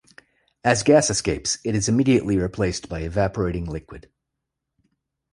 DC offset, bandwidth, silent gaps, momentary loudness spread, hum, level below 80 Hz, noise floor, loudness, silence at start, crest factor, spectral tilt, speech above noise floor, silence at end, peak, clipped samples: under 0.1%; 11.5 kHz; none; 12 LU; none; -42 dBFS; -81 dBFS; -21 LUFS; 0.65 s; 20 dB; -4.5 dB/octave; 60 dB; 1.3 s; -2 dBFS; under 0.1%